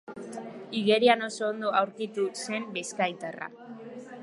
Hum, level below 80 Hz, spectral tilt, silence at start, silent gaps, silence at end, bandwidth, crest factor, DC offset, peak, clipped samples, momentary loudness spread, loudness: none; -82 dBFS; -3.5 dB/octave; 0.1 s; none; 0 s; 11.5 kHz; 22 dB; under 0.1%; -6 dBFS; under 0.1%; 19 LU; -28 LUFS